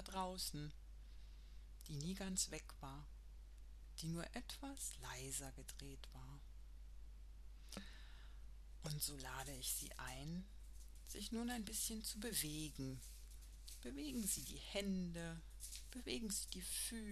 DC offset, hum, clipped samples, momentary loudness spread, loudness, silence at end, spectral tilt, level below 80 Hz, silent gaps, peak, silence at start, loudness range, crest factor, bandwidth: under 0.1%; none; under 0.1%; 18 LU; -47 LUFS; 0 s; -3 dB/octave; -58 dBFS; none; -26 dBFS; 0 s; 7 LU; 24 dB; 13 kHz